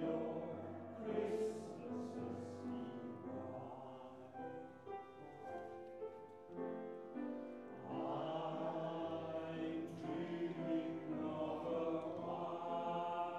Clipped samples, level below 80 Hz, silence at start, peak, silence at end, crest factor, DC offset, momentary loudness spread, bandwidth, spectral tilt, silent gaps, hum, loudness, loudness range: under 0.1%; -88 dBFS; 0 s; -28 dBFS; 0 s; 18 dB; under 0.1%; 10 LU; 11 kHz; -7.5 dB/octave; none; none; -46 LUFS; 8 LU